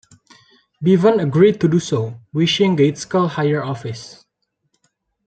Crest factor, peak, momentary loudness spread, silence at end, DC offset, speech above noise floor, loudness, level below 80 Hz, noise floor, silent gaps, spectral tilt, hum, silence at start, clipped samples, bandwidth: 16 dB; -2 dBFS; 13 LU; 1.15 s; under 0.1%; 55 dB; -17 LUFS; -60 dBFS; -72 dBFS; none; -6.5 dB/octave; none; 0.8 s; under 0.1%; 9 kHz